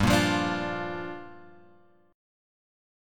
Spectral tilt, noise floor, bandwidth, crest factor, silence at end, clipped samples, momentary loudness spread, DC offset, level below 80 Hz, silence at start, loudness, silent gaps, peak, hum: -5 dB/octave; -60 dBFS; 17.5 kHz; 24 dB; 0.95 s; under 0.1%; 19 LU; under 0.1%; -48 dBFS; 0 s; -28 LUFS; none; -8 dBFS; none